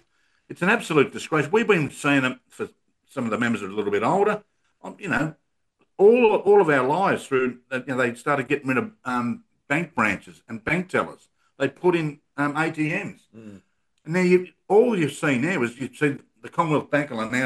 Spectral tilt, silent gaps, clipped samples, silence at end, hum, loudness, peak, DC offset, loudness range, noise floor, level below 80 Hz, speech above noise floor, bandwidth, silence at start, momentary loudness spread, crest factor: -6 dB/octave; none; under 0.1%; 0 s; none; -23 LUFS; -4 dBFS; under 0.1%; 5 LU; -70 dBFS; -62 dBFS; 47 dB; 12.5 kHz; 0.5 s; 13 LU; 20 dB